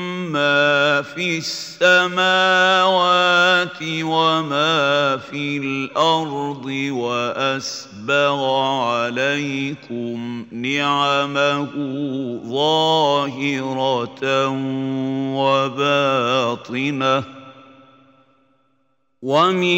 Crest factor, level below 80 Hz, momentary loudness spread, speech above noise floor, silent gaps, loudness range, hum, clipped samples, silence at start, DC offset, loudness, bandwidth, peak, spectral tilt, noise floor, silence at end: 18 dB; -68 dBFS; 11 LU; 49 dB; none; 6 LU; none; under 0.1%; 0 s; under 0.1%; -18 LUFS; 16 kHz; -2 dBFS; -4.5 dB/octave; -68 dBFS; 0 s